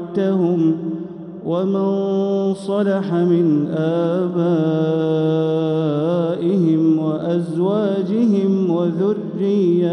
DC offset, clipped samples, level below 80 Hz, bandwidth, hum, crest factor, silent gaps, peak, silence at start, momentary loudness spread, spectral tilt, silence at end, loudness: under 0.1%; under 0.1%; -68 dBFS; 9.8 kHz; none; 12 dB; none; -6 dBFS; 0 s; 4 LU; -9.5 dB/octave; 0 s; -18 LUFS